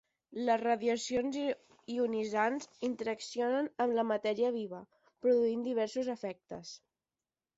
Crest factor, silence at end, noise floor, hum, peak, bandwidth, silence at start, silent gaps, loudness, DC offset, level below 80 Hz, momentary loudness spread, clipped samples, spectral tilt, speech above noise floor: 16 dB; 0.8 s; under -90 dBFS; none; -18 dBFS; 8 kHz; 0.3 s; none; -34 LUFS; under 0.1%; -76 dBFS; 14 LU; under 0.1%; -4.5 dB/octave; over 57 dB